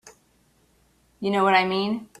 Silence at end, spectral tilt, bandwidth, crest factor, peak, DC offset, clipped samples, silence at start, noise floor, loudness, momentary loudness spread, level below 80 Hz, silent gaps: 0.15 s; -5.5 dB/octave; 13 kHz; 22 dB; -4 dBFS; under 0.1%; under 0.1%; 0.05 s; -63 dBFS; -22 LUFS; 10 LU; -66 dBFS; none